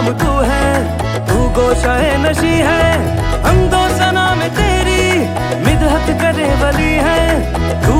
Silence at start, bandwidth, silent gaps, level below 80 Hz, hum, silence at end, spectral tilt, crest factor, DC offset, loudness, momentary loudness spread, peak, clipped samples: 0 s; 16.5 kHz; none; -20 dBFS; none; 0 s; -5.5 dB/octave; 12 dB; under 0.1%; -13 LUFS; 3 LU; 0 dBFS; under 0.1%